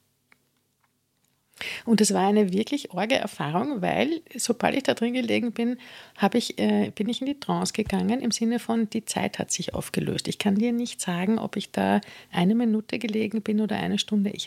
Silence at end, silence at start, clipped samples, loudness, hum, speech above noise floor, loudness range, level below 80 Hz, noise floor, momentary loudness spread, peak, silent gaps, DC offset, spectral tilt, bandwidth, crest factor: 0 s; 1.6 s; under 0.1%; -26 LUFS; none; 46 dB; 2 LU; -58 dBFS; -71 dBFS; 7 LU; -4 dBFS; none; under 0.1%; -4.5 dB/octave; 15.5 kHz; 22 dB